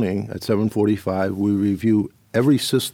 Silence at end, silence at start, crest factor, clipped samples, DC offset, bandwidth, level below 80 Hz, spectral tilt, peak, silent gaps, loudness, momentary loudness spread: 0.05 s; 0 s; 14 dB; under 0.1%; under 0.1%; 17.5 kHz; -56 dBFS; -6 dB/octave; -6 dBFS; none; -21 LUFS; 6 LU